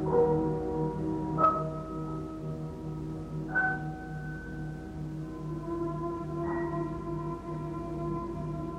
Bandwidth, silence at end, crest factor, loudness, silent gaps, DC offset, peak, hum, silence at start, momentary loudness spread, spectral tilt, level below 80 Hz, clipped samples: 9.4 kHz; 0 s; 20 dB; -33 LUFS; none; under 0.1%; -12 dBFS; none; 0 s; 12 LU; -9 dB/octave; -48 dBFS; under 0.1%